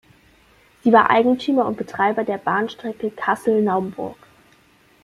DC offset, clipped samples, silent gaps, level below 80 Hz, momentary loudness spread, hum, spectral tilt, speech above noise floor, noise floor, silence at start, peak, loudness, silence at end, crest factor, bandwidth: under 0.1%; under 0.1%; none; -62 dBFS; 13 LU; none; -6.5 dB/octave; 36 dB; -55 dBFS; 0.85 s; -2 dBFS; -19 LUFS; 0.9 s; 20 dB; 13.5 kHz